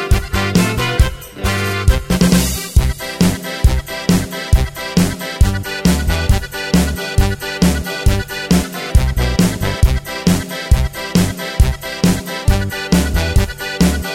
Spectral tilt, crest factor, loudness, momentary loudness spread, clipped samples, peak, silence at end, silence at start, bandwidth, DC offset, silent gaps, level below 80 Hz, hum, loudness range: -5 dB/octave; 14 dB; -16 LUFS; 3 LU; under 0.1%; 0 dBFS; 0 s; 0 s; 16.5 kHz; 0.2%; none; -20 dBFS; none; 1 LU